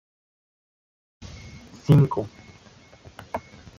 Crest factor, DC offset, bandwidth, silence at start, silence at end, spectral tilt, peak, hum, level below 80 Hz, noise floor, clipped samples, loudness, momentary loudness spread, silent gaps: 22 dB; under 0.1%; 7.2 kHz; 1.2 s; 0.4 s; -8.5 dB/octave; -4 dBFS; none; -54 dBFS; -51 dBFS; under 0.1%; -23 LUFS; 26 LU; none